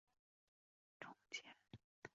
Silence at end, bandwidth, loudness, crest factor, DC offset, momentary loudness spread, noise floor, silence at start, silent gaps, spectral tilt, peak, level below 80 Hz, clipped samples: 0.05 s; 7.4 kHz; -56 LUFS; 26 dB; under 0.1%; 12 LU; under -90 dBFS; 1 s; 1.84-2.02 s; -1 dB/octave; -36 dBFS; -88 dBFS; under 0.1%